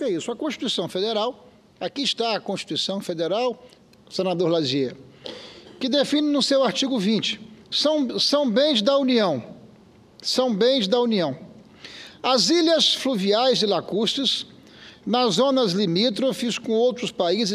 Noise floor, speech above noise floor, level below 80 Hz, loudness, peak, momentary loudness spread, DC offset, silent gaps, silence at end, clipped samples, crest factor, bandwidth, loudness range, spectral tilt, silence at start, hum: -51 dBFS; 29 dB; -68 dBFS; -22 LUFS; -6 dBFS; 13 LU; under 0.1%; none; 0 s; under 0.1%; 18 dB; 14.5 kHz; 5 LU; -4 dB/octave; 0 s; none